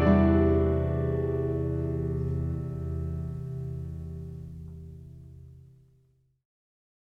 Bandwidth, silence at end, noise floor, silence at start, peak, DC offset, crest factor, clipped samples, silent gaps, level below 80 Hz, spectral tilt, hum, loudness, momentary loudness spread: 4.5 kHz; 1.55 s; -66 dBFS; 0 s; -10 dBFS; under 0.1%; 20 dB; under 0.1%; none; -38 dBFS; -10.5 dB/octave; none; -29 LUFS; 23 LU